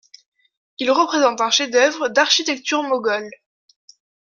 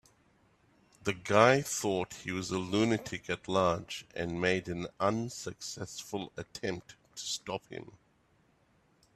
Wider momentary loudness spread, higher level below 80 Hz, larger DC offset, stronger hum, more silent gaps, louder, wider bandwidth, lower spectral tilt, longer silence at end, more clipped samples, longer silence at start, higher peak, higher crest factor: second, 8 LU vs 14 LU; second, -72 dBFS vs -64 dBFS; neither; neither; neither; first, -18 LUFS vs -33 LUFS; second, 7.4 kHz vs 15.5 kHz; second, -0.5 dB/octave vs -4.5 dB/octave; second, 0.95 s vs 1.25 s; neither; second, 0.8 s vs 1.05 s; first, -2 dBFS vs -8 dBFS; second, 18 dB vs 26 dB